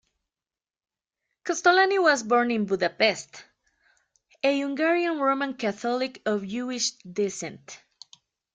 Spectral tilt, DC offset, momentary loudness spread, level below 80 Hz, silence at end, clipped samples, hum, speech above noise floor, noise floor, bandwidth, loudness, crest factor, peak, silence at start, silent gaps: -3 dB/octave; under 0.1%; 16 LU; -74 dBFS; 0.8 s; under 0.1%; none; over 65 dB; under -90 dBFS; 9.6 kHz; -25 LUFS; 20 dB; -8 dBFS; 1.45 s; none